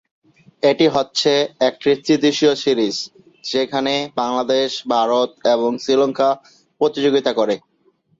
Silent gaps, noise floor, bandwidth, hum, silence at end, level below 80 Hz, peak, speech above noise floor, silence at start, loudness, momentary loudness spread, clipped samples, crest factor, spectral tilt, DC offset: none; -60 dBFS; 7.8 kHz; none; 0.6 s; -62 dBFS; -2 dBFS; 43 dB; 0.65 s; -18 LUFS; 6 LU; under 0.1%; 16 dB; -4 dB/octave; under 0.1%